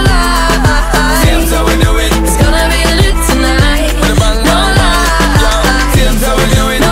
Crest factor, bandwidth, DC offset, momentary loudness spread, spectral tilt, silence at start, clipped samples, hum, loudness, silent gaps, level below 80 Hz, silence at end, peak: 8 dB; 16.5 kHz; under 0.1%; 2 LU; -4.5 dB/octave; 0 s; under 0.1%; none; -10 LUFS; none; -12 dBFS; 0 s; 0 dBFS